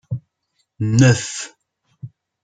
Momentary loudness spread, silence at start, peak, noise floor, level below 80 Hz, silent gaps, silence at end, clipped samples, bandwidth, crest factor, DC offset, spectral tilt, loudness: 26 LU; 0.1 s; -2 dBFS; -70 dBFS; -52 dBFS; none; 0.35 s; under 0.1%; 9.4 kHz; 18 dB; under 0.1%; -5.5 dB/octave; -17 LUFS